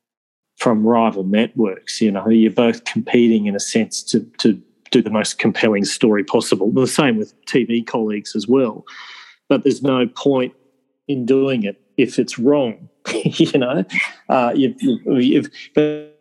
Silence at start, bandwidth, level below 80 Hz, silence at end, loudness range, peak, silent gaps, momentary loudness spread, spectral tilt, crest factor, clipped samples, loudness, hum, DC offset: 0.6 s; 12 kHz; -66 dBFS; 0.15 s; 3 LU; 0 dBFS; none; 8 LU; -5 dB/octave; 16 dB; under 0.1%; -18 LUFS; none; under 0.1%